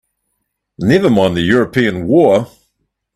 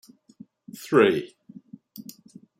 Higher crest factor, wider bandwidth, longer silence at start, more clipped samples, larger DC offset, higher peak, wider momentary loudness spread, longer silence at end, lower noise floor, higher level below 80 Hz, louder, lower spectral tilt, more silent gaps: second, 14 dB vs 22 dB; second, 13.5 kHz vs 16 kHz; about the same, 0.8 s vs 0.8 s; neither; neither; first, 0 dBFS vs -4 dBFS; second, 6 LU vs 25 LU; about the same, 0.7 s vs 0.6 s; first, -71 dBFS vs -51 dBFS; first, -46 dBFS vs -74 dBFS; first, -13 LUFS vs -21 LUFS; first, -7 dB/octave vs -5.5 dB/octave; neither